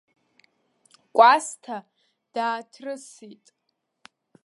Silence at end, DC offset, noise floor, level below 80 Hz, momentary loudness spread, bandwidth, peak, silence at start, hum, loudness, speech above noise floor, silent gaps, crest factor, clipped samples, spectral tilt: 1.15 s; under 0.1%; -65 dBFS; -86 dBFS; 21 LU; 11.5 kHz; -2 dBFS; 1.15 s; none; -21 LUFS; 42 dB; none; 24 dB; under 0.1%; -1.5 dB/octave